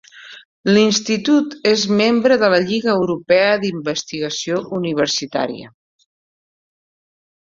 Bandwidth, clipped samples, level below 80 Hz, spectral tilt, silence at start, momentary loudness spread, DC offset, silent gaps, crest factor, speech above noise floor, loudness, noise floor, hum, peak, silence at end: 7.8 kHz; under 0.1%; -60 dBFS; -4 dB/octave; 0.15 s; 9 LU; under 0.1%; 0.45-0.64 s; 18 dB; over 73 dB; -17 LUFS; under -90 dBFS; none; 0 dBFS; 1.8 s